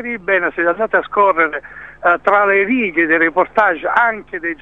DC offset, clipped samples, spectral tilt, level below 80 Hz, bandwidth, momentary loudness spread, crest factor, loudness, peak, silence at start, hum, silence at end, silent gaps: 0.3%; under 0.1%; -6.5 dB/octave; -52 dBFS; 7.2 kHz; 6 LU; 16 dB; -15 LUFS; 0 dBFS; 0 s; none; 0.1 s; none